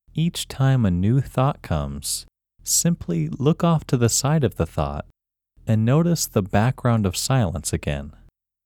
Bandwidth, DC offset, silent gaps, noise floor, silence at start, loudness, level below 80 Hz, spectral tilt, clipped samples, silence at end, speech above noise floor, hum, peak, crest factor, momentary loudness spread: 17.5 kHz; under 0.1%; none; -59 dBFS; 0.15 s; -22 LUFS; -40 dBFS; -5 dB/octave; under 0.1%; 0.55 s; 38 dB; none; -6 dBFS; 16 dB; 9 LU